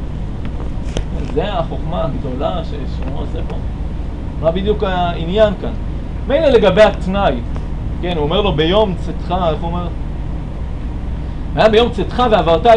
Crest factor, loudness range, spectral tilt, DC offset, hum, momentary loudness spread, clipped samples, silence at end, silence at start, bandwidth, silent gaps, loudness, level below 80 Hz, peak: 14 dB; 7 LU; -7 dB/octave; under 0.1%; none; 14 LU; under 0.1%; 0 s; 0 s; 10 kHz; none; -17 LUFS; -22 dBFS; 0 dBFS